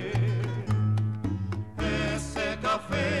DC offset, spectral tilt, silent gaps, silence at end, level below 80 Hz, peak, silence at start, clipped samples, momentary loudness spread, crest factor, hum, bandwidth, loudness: 0.3%; -6 dB/octave; none; 0 s; -42 dBFS; -16 dBFS; 0 s; under 0.1%; 5 LU; 12 dB; none; 11.5 kHz; -29 LUFS